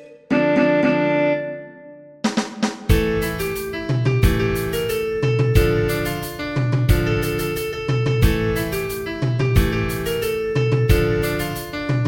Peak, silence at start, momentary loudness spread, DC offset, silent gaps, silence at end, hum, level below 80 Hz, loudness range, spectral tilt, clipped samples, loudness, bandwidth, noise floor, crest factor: -2 dBFS; 0 s; 8 LU; under 0.1%; none; 0 s; none; -28 dBFS; 2 LU; -6.5 dB/octave; under 0.1%; -20 LUFS; 17 kHz; -42 dBFS; 18 dB